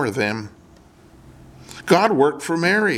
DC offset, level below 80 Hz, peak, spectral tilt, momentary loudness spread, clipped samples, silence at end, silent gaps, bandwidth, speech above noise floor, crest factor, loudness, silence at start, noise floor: under 0.1%; -56 dBFS; -2 dBFS; -5 dB/octave; 20 LU; under 0.1%; 0 s; none; 15.5 kHz; 30 dB; 20 dB; -19 LUFS; 0 s; -49 dBFS